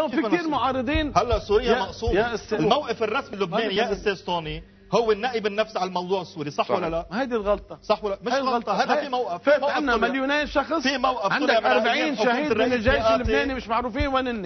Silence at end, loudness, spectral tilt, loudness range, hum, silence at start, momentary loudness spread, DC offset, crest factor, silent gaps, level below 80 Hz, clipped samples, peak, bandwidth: 0 s; -23 LUFS; -5 dB/octave; 4 LU; none; 0 s; 6 LU; under 0.1%; 20 dB; none; -40 dBFS; under 0.1%; -4 dBFS; 6.4 kHz